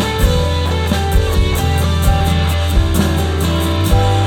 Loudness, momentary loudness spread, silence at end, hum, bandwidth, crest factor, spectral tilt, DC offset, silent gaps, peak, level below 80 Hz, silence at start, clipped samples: -15 LUFS; 2 LU; 0 s; none; 17.5 kHz; 12 dB; -5.5 dB/octave; under 0.1%; none; 0 dBFS; -18 dBFS; 0 s; under 0.1%